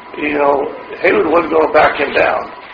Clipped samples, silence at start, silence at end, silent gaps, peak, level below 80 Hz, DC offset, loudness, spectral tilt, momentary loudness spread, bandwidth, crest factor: under 0.1%; 0 s; 0 s; none; 0 dBFS; -46 dBFS; under 0.1%; -13 LUFS; -2.5 dB/octave; 7 LU; 6.8 kHz; 14 dB